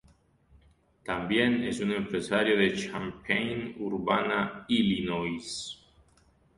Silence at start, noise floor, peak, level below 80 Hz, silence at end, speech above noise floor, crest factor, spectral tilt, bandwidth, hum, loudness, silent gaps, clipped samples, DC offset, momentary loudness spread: 1.05 s; -64 dBFS; -12 dBFS; -58 dBFS; 0.8 s; 35 dB; 20 dB; -5 dB/octave; 11.5 kHz; none; -29 LUFS; none; under 0.1%; under 0.1%; 11 LU